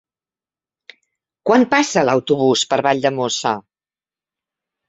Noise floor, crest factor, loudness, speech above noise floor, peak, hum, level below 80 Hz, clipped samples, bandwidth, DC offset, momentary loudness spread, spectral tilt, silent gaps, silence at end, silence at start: under -90 dBFS; 18 dB; -17 LUFS; over 74 dB; -2 dBFS; none; -62 dBFS; under 0.1%; 8.4 kHz; under 0.1%; 8 LU; -4 dB/octave; none; 1.3 s; 1.45 s